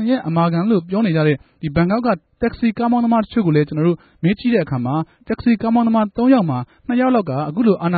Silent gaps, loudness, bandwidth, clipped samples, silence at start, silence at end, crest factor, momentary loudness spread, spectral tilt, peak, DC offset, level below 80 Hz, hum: none; -18 LUFS; 4.8 kHz; under 0.1%; 0 s; 0 s; 16 dB; 7 LU; -13 dB/octave; -2 dBFS; under 0.1%; -46 dBFS; none